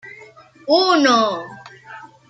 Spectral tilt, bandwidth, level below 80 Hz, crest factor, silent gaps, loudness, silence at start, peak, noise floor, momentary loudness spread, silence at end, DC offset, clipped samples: -3 dB/octave; 9 kHz; -70 dBFS; 18 dB; none; -15 LUFS; 0.05 s; -2 dBFS; -45 dBFS; 25 LU; 0.25 s; under 0.1%; under 0.1%